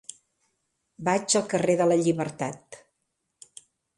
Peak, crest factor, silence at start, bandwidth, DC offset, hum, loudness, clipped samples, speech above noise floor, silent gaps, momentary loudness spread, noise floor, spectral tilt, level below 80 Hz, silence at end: -8 dBFS; 20 dB; 1 s; 11.5 kHz; under 0.1%; none; -25 LUFS; under 0.1%; 54 dB; none; 13 LU; -79 dBFS; -4.5 dB/octave; -70 dBFS; 1.2 s